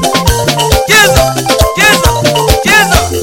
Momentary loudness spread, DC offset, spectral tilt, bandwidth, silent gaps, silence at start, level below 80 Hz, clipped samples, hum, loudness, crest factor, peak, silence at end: 5 LU; under 0.1%; -3 dB/octave; 17.5 kHz; none; 0 s; -18 dBFS; 0.3%; none; -7 LUFS; 8 dB; 0 dBFS; 0 s